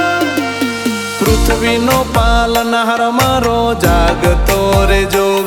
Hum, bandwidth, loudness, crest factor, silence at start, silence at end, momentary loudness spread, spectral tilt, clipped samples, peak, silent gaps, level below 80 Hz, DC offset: none; 18 kHz; -13 LUFS; 12 dB; 0 s; 0 s; 4 LU; -4.5 dB/octave; under 0.1%; 0 dBFS; none; -20 dBFS; under 0.1%